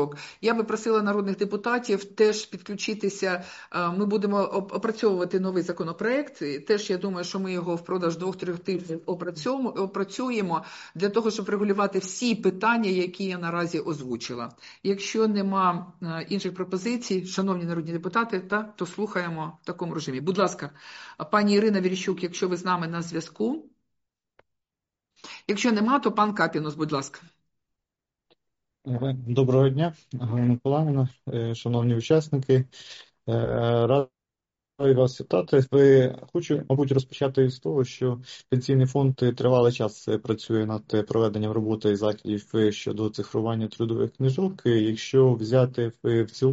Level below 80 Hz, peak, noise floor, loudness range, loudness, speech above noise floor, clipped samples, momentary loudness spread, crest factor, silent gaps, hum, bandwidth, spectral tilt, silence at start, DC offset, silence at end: -62 dBFS; -8 dBFS; -89 dBFS; 6 LU; -26 LUFS; 64 dB; under 0.1%; 10 LU; 18 dB; none; none; 8 kHz; -6 dB/octave; 0 s; under 0.1%; 0 s